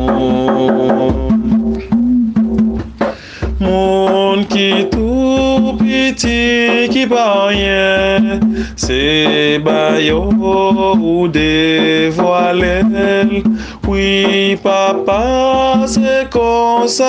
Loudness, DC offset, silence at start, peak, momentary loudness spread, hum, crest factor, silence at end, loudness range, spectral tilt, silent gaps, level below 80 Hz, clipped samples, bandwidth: -12 LUFS; under 0.1%; 0 s; 0 dBFS; 4 LU; none; 12 dB; 0 s; 2 LU; -5 dB/octave; none; -28 dBFS; under 0.1%; 9.4 kHz